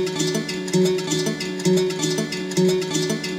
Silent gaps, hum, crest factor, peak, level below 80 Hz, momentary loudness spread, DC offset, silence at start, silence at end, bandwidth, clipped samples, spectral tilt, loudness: none; none; 14 dB; -8 dBFS; -60 dBFS; 4 LU; under 0.1%; 0 s; 0 s; 16.5 kHz; under 0.1%; -4.5 dB/octave; -22 LUFS